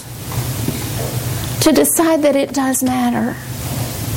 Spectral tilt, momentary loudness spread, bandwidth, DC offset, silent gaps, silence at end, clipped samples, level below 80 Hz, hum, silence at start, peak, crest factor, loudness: -4.5 dB/octave; 10 LU; 17 kHz; under 0.1%; none; 0 s; under 0.1%; -38 dBFS; none; 0 s; -4 dBFS; 14 dB; -17 LUFS